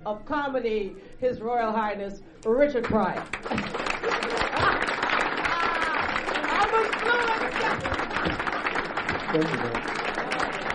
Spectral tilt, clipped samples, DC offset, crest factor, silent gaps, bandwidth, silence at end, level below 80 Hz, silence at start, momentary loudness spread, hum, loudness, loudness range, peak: -4.5 dB/octave; under 0.1%; under 0.1%; 18 dB; none; 11 kHz; 0 s; -46 dBFS; 0 s; 7 LU; none; -26 LUFS; 3 LU; -8 dBFS